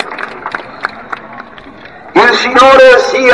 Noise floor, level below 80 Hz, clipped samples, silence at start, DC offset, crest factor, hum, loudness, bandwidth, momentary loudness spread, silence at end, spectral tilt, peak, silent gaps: -32 dBFS; -44 dBFS; 2%; 0 s; under 0.1%; 10 dB; none; -5 LUFS; 11 kHz; 21 LU; 0 s; -3 dB/octave; 0 dBFS; none